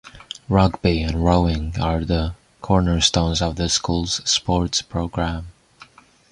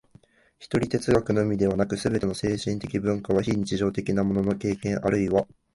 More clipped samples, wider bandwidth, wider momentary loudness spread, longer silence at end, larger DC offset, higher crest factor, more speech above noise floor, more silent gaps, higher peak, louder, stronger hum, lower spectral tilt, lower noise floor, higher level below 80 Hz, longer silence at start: neither; about the same, 11 kHz vs 11.5 kHz; first, 9 LU vs 4 LU; first, 0.8 s vs 0.3 s; neither; about the same, 20 dB vs 18 dB; about the same, 29 dB vs 32 dB; neither; first, -2 dBFS vs -6 dBFS; first, -20 LUFS vs -25 LUFS; neither; second, -4.5 dB/octave vs -6.5 dB/octave; second, -48 dBFS vs -57 dBFS; first, -30 dBFS vs -48 dBFS; second, 0.05 s vs 0.6 s